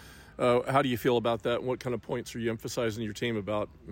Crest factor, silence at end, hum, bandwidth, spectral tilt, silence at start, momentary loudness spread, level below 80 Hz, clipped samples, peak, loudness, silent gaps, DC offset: 16 dB; 0 s; none; 16.5 kHz; -5.5 dB/octave; 0 s; 8 LU; -58 dBFS; under 0.1%; -12 dBFS; -30 LUFS; none; under 0.1%